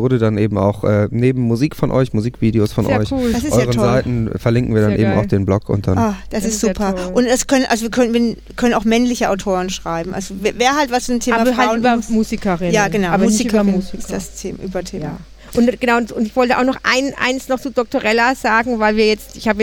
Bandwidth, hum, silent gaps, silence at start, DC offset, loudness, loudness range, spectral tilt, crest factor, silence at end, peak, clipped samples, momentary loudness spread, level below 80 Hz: 18 kHz; none; none; 0 s; under 0.1%; -16 LUFS; 2 LU; -5.5 dB/octave; 14 dB; 0 s; -2 dBFS; under 0.1%; 7 LU; -36 dBFS